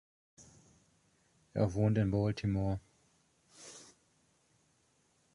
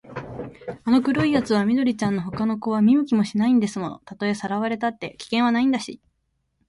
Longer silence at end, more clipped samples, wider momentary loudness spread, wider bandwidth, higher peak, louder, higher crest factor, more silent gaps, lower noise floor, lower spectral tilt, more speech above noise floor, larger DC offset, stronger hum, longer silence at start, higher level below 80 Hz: first, 1.5 s vs 0.75 s; neither; first, 21 LU vs 15 LU; about the same, 11 kHz vs 11.5 kHz; second, -20 dBFS vs -8 dBFS; second, -34 LUFS vs -22 LUFS; about the same, 18 dB vs 16 dB; neither; about the same, -73 dBFS vs -72 dBFS; first, -7.5 dB/octave vs -6 dB/octave; second, 42 dB vs 51 dB; neither; neither; first, 0.4 s vs 0.05 s; about the same, -56 dBFS vs -56 dBFS